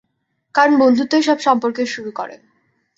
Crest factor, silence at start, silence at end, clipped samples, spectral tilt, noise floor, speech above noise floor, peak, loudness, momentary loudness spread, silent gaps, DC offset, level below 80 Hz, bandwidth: 16 dB; 0.55 s; 0.65 s; under 0.1%; -4 dB/octave; -70 dBFS; 55 dB; -2 dBFS; -16 LUFS; 15 LU; none; under 0.1%; -66 dBFS; 8 kHz